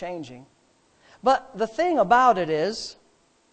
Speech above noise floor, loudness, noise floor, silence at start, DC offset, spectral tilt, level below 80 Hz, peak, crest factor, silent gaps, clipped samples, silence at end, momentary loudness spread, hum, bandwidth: 40 dB; -22 LUFS; -62 dBFS; 0 s; under 0.1%; -4.5 dB/octave; -60 dBFS; -6 dBFS; 18 dB; none; under 0.1%; 0.6 s; 19 LU; none; 9 kHz